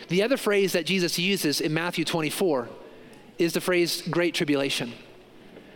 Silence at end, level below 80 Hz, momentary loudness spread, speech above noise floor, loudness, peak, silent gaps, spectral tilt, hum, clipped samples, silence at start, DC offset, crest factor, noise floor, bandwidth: 0.05 s; -64 dBFS; 7 LU; 24 dB; -25 LUFS; -10 dBFS; none; -4 dB/octave; none; under 0.1%; 0 s; under 0.1%; 16 dB; -49 dBFS; 17 kHz